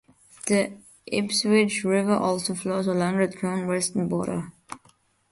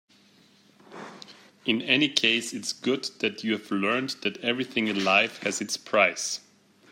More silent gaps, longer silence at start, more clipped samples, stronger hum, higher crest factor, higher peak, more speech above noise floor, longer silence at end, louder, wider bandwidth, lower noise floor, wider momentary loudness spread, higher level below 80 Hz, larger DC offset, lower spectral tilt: neither; second, 0.45 s vs 0.9 s; neither; neither; second, 18 dB vs 24 dB; second, -8 dBFS vs -4 dBFS; first, 37 dB vs 32 dB; about the same, 0.55 s vs 0.5 s; about the same, -25 LUFS vs -25 LUFS; second, 11.5 kHz vs 16 kHz; about the same, -61 dBFS vs -59 dBFS; first, 16 LU vs 13 LU; first, -62 dBFS vs -74 dBFS; neither; first, -4.5 dB/octave vs -2.5 dB/octave